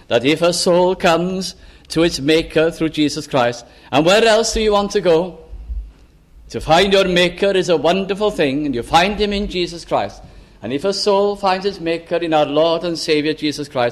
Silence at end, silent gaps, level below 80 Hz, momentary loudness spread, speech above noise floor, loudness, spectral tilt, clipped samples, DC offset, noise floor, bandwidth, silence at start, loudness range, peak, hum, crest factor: 0 s; none; -38 dBFS; 11 LU; 29 dB; -16 LUFS; -4.5 dB/octave; under 0.1%; under 0.1%; -45 dBFS; 15 kHz; 0.1 s; 3 LU; -2 dBFS; none; 16 dB